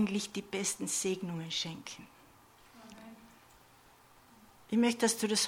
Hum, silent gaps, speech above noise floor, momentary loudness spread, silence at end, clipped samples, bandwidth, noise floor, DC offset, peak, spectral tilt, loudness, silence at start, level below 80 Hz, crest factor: none; none; 28 dB; 23 LU; 0 s; under 0.1%; 17.5 kHz; -61 dBFS; under 0.1%; -18 dBFS; -3 dB/octave; -33 LUFS; 0 s; -72 dBFS; 18 dB